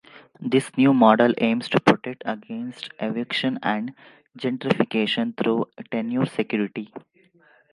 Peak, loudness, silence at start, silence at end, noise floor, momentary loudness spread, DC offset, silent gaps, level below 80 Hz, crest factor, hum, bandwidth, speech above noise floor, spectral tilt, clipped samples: 0 dBFS; -23 LUFS; 0.15 s; 0.75 s; -58 dBFS; 15 LU; under 0.1%; none; -68 dBFS; 22 dB; none; 11.5 kHz; 35 dB; -6.5 dB/octave; under 0.1%